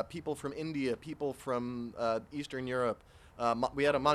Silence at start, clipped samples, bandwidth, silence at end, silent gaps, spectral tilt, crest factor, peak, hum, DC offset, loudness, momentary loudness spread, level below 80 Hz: 0 s; under 0.1%; 14.5 kHz; 0 s; none; -5.5 dB/octave; 20 dB; -14 dBFS; none; under 0.1%; -35 LUFS; 8 LU; -62 dBFS